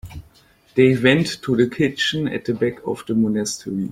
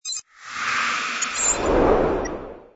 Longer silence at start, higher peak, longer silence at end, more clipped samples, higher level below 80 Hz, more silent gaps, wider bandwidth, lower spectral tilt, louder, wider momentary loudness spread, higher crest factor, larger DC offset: about the same, 0.05 s vs 0.05 s; about the same, -2 dBFS vs -4 dBFS; about the same, 0 s vs 0.1 s; neither; second, -50 dBFS vs -36 dBFS; neither; first, 15.5 kHz vs 8.2 kHz; first, -5 dB/octave vs -2.5 dB/octave; about the same, -20 LUFS vs -22 LUFS; second, 10 LU vs 13 LU; about the same, 18 dB vs 18 dB; neither